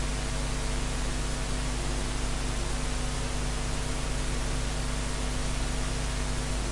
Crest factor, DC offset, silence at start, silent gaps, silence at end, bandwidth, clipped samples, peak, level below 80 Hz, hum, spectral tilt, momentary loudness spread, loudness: 12 dB; under 0.1%; 0 s; none; 0 s; 11.5 kHz; under 0.1%; -18 dBFS; -32 dBFS; none; -4 dB/octave; 0 LU; -32 LUFS